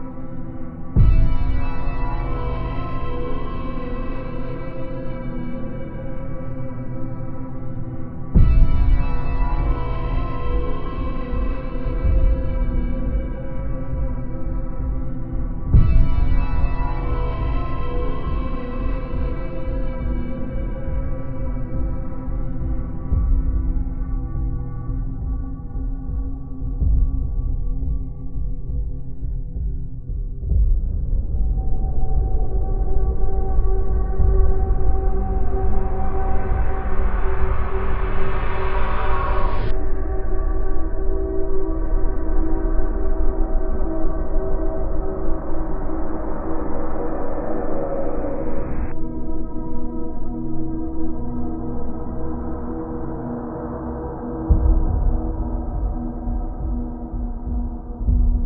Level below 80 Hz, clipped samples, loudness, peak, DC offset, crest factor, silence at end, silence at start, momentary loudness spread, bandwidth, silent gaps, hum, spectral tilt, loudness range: -22 dBFS; under 0.1%; -26 LUFS; -2 dBFS; under 0.1%; 16 dB; 0 s; 0 s; 9 LU; 3.4 kHz; none; none; -11.5 dB/octave; 5 LU